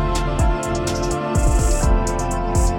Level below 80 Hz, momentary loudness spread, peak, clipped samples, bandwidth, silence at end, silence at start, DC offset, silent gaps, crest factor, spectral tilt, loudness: -20 dBFS; 3 LU; -6 dBFS; under 0.1%; 16.5 kHz; 0 s; 0 s; under 0.1%; none; 12 dB; -5.5 dB/octave; -20 LUFS